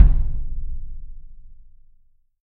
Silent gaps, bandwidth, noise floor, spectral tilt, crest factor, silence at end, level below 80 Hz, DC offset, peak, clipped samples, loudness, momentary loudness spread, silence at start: none; 1.8 kHz; -55 dBFS; -10.5 dB/octave; 20 dB; 0.9 s; -22 dBFS; under 0.1%; 0 dBFS; under 0.1%; -27 LUFS; 23 LU; 0 s